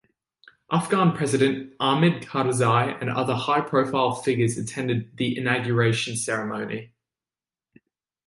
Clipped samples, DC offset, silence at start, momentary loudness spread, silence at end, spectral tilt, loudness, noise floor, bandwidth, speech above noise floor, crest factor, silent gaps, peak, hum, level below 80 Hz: under 0.1%; under 0.1%; 0.7 s; 7 LU; 1.4 s; -5.5 dB/octave; -24 LUFS; under -90 dBFS; 11.5 kHz; over 67 dB; 18 dB; none; -6 dBFS; none; -62 dBFS